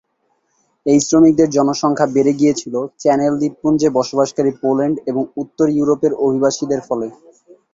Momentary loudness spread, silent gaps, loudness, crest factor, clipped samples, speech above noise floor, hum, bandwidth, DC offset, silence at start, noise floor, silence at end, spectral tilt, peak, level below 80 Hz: 10 LU; none; -16 LUFS; 14 dB; under 0.1%; 50 dB; none; 7.8 kHz; under 0.1%; 0.85 s; -65 dBFS; 0.6 s; -5.5 dB/octave; -2 dBFS; -56 dBFS